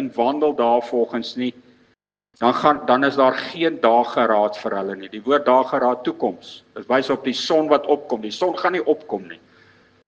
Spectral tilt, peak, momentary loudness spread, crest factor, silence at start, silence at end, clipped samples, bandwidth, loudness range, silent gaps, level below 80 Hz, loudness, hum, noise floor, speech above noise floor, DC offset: -5 dB/octave; 0 dBFS; 11 LU; 20 dB; 0 s; 0.7 s; under 0.1%; 8.2 kHz; 3 LU; none; -68 dBFS; -20 LUFS; none; -64 dBFS; 45 dB; under 0.1%